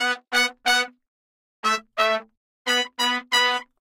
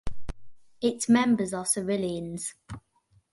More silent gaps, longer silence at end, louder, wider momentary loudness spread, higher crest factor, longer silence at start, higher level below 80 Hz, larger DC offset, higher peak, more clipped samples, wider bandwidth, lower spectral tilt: first, 1.08-1.63 s, 2.37-2.65 s vs none; second, 0.15 s vs 0.55 s; first, -22 LUFS vs -27 LUFS; second, 8 LU vs 23 LU; about the same, 20 dB vs 18 dB; about the same, 0 s vs 0.05 s; second, -70 dBFS vs -48 dBFS; neither; first, -4 dBFS vs -10 dBFS; neither; first, 16.5 kHz vs 12 kHz; second, 0.5 dB/octave vs -4.5 dB/octave